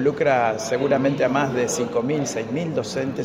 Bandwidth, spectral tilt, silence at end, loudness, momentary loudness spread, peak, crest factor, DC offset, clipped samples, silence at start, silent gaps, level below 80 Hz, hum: 16 kHz; -5 dB/octave; 0 s; -22 LUFS; 6 LU; -6 dBFS; 16 dB; under 0.1%; under 0.1%; 0 s; none; -58 dBFS; none